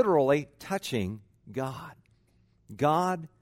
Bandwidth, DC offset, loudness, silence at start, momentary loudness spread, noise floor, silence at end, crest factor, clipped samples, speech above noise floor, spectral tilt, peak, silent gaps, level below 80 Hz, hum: 16 kHz; under 0.1%; -29 LUFS; 0 s; 20 LU; -66 dBFS; 0.15 s; 18 dB; under 0.1%; 38 dB; -6 dB/octave; -12 dBFS; none; -64 dBFS; none